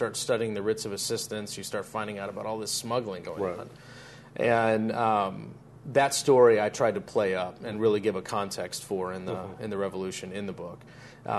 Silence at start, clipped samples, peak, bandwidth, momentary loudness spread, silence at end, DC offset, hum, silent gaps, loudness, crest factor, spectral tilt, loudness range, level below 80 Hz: 0 s; under 0.1%; -8 dBFS; 12.5 kHz; 18 LU; 0 s; under 0.1%; none; none; -28 LUFS; 22 dB; -4 dB/octave; 8 LU; -66 dBFS